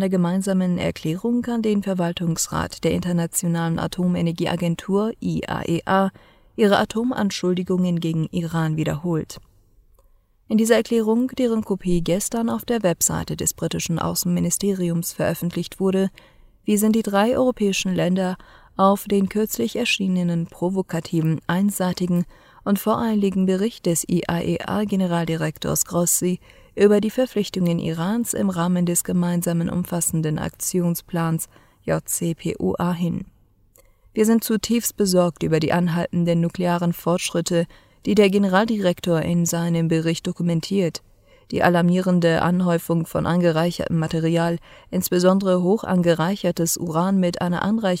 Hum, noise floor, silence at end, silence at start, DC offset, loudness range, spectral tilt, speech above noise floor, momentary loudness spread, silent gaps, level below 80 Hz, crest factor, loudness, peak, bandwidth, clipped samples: none; -57 dBFS; 0 s; 0 s; under 0.1%; 3 LU; -5.5 dB/octave; 36 dB; 6 LU; none; -50 dBFS; 18 dB; -21 LUFS; -2 dBFS; 16 kHz; under 0.1%